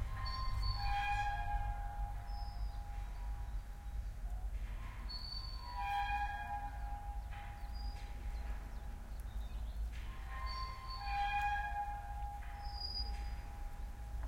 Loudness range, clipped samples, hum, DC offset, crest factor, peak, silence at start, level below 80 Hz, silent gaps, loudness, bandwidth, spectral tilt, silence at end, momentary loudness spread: 5 LU; under 0.1%; none; under 0.1%; 14 dB; -26 dBFS; 0 s; -44 dBFS; none; -43 LUFS; 16 kHz; -4.5 dB/octave; 0 s; 11 LU